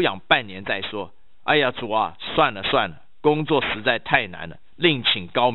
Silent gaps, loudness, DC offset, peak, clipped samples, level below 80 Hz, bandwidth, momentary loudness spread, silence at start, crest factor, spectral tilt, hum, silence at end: none; -21 LUFS; 1%; -2 dBFS; under 0.1%; -52 dBFS; 4.8 kHz; 12 LU; 0 s; 22 dB; -7.5 dB/octave; none; 0 s